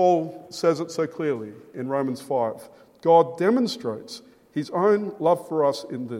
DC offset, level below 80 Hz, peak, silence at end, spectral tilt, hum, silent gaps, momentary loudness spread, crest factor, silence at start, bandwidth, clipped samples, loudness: under 0.1%; -74 dBFS; -6 dBFS; 0 s; -6 dB/octave; none; none; 15 LU; 18 dB; 0 s; 15.5 kHz; under 0.1%; -24 LUFS